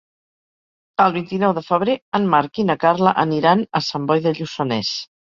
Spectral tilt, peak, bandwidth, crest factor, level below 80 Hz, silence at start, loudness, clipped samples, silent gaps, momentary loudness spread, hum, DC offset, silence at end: -6 dB/octave; -2 dBFS; 7.4 kHz; 18 dB; -60 dBFS; 1 s; -19 LUFS; under 0.1%; 2.02-2.12 s; 6 LU; none; under 0.1%; 0.35 s